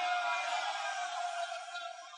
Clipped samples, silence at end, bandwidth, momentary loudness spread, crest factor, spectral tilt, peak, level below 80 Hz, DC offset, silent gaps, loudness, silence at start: under 0.1%; 0 s; 11 kHz; 9 LU; 14 dB; 4.5 dB/octave; -24 dBFS; under -90 dBFS; under 0.1%; none; -36 LUFS; 0 s